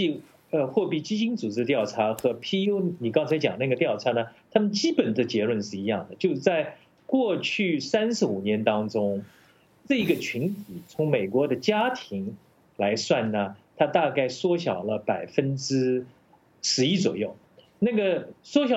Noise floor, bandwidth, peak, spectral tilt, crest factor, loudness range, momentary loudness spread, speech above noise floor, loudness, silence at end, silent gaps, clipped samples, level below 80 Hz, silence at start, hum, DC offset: -56 dBFS; 16.5 kHz; -6 dBFS; -5 dB/octave; 20 dB; 2 LU; 6 LU; 31 dB; -26 LUFS; 0 s; none; under 0.1%; -72 dBFS; 0 s; none; under 0.1%